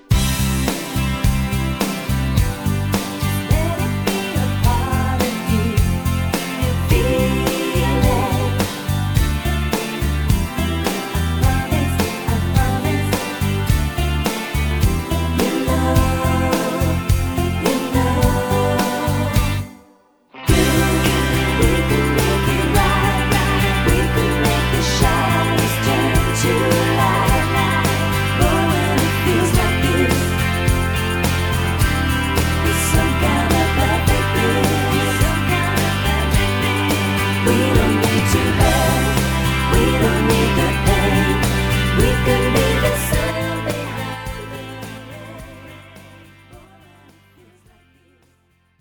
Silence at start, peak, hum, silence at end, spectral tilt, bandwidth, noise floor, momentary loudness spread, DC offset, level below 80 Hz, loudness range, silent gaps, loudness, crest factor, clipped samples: 0.1 s; 0 dBFS; none; 2.2 s; -5 dB/octave; over 20 kHz; -59 dBFS; 5 LU; under 0.1%; -24 dBFS; 4 LU; none; -18 LUFS; 16 dB; under 0.1%